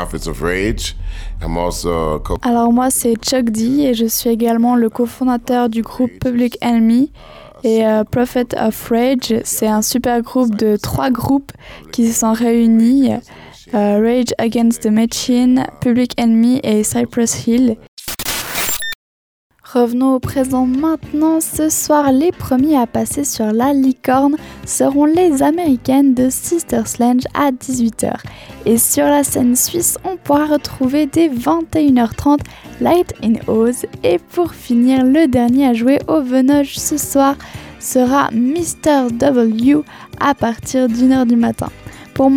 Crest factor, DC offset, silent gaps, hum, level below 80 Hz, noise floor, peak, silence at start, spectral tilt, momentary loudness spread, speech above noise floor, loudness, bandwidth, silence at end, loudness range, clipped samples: 12 dB; under 0.1%; 17.88-17.97 s, 18.95-19.50 s; none; -36 dBFS; under -90 dBFS; -2 dBFS; 0 s; -4.5 dB/octave; 7 LU; over 76 dB; -15 LUFS; over 20 kHz; 0 s; 2 LU; under 0.1%